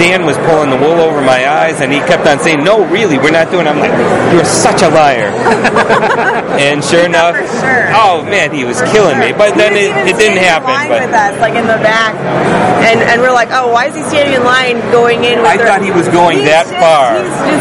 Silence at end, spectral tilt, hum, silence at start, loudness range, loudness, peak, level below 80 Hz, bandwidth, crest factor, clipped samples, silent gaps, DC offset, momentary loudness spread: 0 s; -4 dB/octave; none; 0 s; 1 LU; -8 LUFS; 0 dBFS; -44 dBFS; 12 kHz; 8 dB; 0.5%; none; under 0.1%; 4 LU